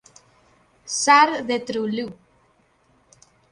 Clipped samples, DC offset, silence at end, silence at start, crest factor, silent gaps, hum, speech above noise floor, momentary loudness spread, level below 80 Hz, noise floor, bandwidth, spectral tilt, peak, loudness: under 0.1%; under 0.1%; 1.4 s; 0.85 s; 20 dB; none; none; 42 dB; 14 LU; -66 dBFS; -61 dBFS; 11 kHz; -2 dB/octave; -4 dBFS; -20 LUFS